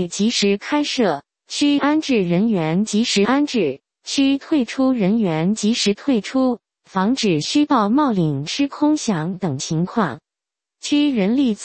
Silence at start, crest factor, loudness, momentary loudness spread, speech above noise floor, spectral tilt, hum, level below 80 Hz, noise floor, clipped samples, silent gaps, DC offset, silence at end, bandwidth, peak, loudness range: 0 s; 16 dB; -19 LUFS; 7 LU; 69 dB; -5 dB/octave; none; -58 dBFS; -87 dBFS; under 0.1%; none; under 0.1%; 0 s; 8.8 kHz; -4 dBFS; 2 LU